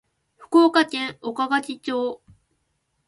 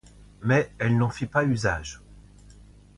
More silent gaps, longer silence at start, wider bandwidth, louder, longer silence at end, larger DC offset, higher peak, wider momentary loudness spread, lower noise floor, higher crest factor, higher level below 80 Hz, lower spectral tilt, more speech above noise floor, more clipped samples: neither; about the same, 0.4 s vs 0.4 s; about the same, 11.5 kHz vs 11 kHz; first, -22 LUFS vs -25 LUFS; first, 0.9 s vs 0.75 s; neither; first, -4 dBFS vs -8 dBFS; about the same, 12 LU vs 11 LU; first, -72 dBFS vs -50 dBFS; about the same, 18 dB vs 18 dB; second, -68 dBFS vs -48 dBFS; second, -3.5 dB/octave vs -6.5 dB/octave; first, 51 dB vs 26 dB; neither